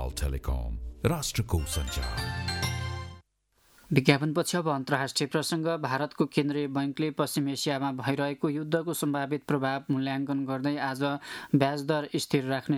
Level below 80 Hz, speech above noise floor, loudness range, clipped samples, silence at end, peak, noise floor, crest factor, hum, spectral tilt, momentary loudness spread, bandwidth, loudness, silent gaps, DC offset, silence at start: -42 dBFS; 39 dB; 3 LU; under 0.1%; 0 s; -6 dBFS; -68 dBFS; 24 dB; none; -5 dB/octave; 6 LU; 17 kHz; -29 LUFS; none; under 0.1%; 0 s